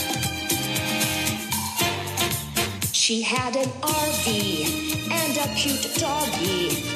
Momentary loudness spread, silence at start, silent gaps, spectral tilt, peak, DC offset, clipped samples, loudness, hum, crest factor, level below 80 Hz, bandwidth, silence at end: 4 LU; 0 s; none; -2.5 dB/octave; -8 dBFS; under 0.1%; under 0.1%; -23 LUFS; none; 18 dB; -50 dBFS; 15 kHz; 0 s